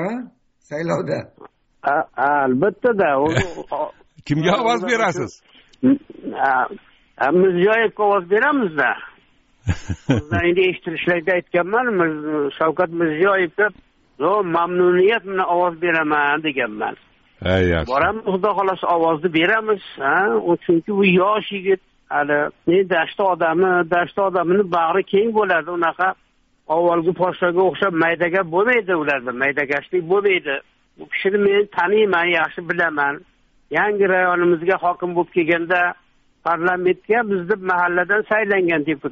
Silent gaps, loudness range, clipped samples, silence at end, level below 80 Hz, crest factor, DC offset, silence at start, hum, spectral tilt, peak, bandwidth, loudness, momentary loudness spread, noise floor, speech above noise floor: none; 2 LU; under 0.1%; 0 s; -48 dBFS; 16 dB; under 0.1%; 0 s; none; -4 dB/octave; -4 dBFS; 7.6 kHz; -19 LUFS; 7 LU; -56 dBFS; 37 dB